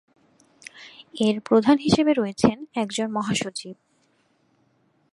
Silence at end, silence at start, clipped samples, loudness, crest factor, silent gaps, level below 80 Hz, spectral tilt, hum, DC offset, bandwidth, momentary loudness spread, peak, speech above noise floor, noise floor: 1.4 s; 0.75 s; under 0.1%; -22 LUFS; 22 dB; none; -56 dBFS; -5 dB/octave; none; under 0.1%; 11.5 kHz; 23 LU; -2 dBFS; 44 dB; -65 dBFS